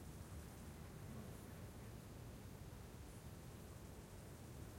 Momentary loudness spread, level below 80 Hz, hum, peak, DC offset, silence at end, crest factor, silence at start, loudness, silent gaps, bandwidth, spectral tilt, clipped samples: 2 LU; -62 dBFS; none; -42 dBFS; under 0.1%; 0 s; 14 dB; 0 s; -56 LUFS; none; 16.5 kHz; -5.5 dB/octave; under 0.1%